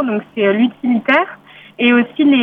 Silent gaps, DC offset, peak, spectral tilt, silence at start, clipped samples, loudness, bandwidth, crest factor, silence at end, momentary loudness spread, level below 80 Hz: none; under 0.1%; -2 dBFS; -7.5 dB/octave; 0 s; under 0.1%; -15 LUFS; 4.4 kHz; 14 dB; 0 s; 5 LU; -64 dBFS